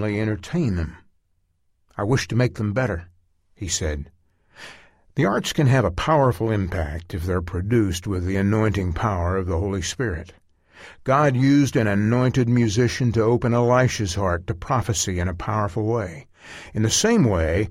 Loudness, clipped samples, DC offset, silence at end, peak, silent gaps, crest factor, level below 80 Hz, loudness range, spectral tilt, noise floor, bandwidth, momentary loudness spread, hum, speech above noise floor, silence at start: -22 LUFS; under 0.1%; under 0.1%; 0 s; -6 dBFS; none; 16 dB; -38 dBFS; 6 LU; -5.5 dB/octave; -67 dBFS; 15.5 kHz; 14 LU; none; 46 dB; 0 s